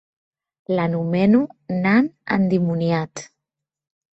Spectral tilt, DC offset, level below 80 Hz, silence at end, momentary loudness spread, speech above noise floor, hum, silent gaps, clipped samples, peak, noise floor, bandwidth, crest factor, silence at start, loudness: -7.5 dB/octave; under 0.1%; -60 dBFS; 0.9 s; 8 LU; 65 dB; none; none; under 0.1%; -4 dBFS; -85 dBFS; 8.2 kHz; 16 dB; 0.7 s; -20 LUFS